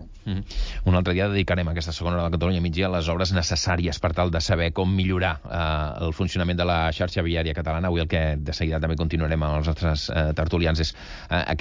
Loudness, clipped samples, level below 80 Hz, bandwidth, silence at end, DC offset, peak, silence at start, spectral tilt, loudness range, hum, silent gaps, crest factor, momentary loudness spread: -24 LUFS; under 0.1%; -30 dBFS; 7.6 kHz; 0 s; under 0.1%; -10 dBFS; 0 s; -6 dB/octave; 1 LU; none; none; 14 dB; 5 LU